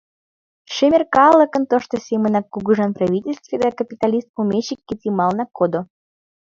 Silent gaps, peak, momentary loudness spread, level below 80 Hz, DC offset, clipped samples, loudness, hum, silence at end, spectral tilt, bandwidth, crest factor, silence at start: 4.29-4.34 s; 0 dBFS; 12 LU; -58 dBFS; under 0.1%; under 0.1%; -18 LUFS; none; 0.65 s; -6.5 dB/octave; 7.6 kHz; 18 dB; 0.7 s